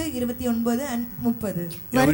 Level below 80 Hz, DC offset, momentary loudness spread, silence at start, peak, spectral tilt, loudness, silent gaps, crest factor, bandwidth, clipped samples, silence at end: -46 dBFS; under 0.1%; 5 LU; 0 s; -10 dBFS; -5.5 dB/octave; -26 LUFS; none; 14 dB; 18.5 kHz; under 0.1%; 0 s